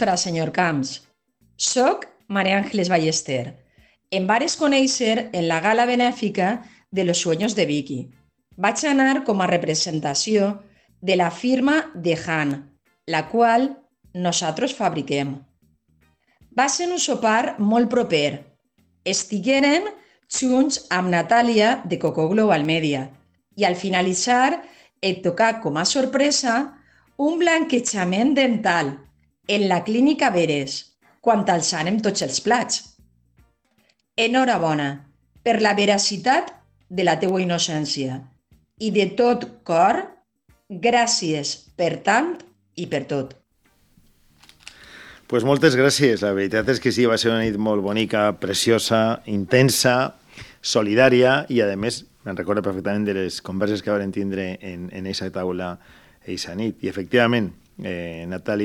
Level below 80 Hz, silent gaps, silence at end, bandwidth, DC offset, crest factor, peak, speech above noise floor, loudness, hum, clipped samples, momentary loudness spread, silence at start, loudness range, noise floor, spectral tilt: -60 dBFS; none; 0 s; 15.5 kHz; under 0.1%; 20 dB; -2 dBFS; 44 dB; -21 LUFS; none; under 0.1%; 12 LU; 0 s; 5 LU; -65 dBFS; -4 dB/octave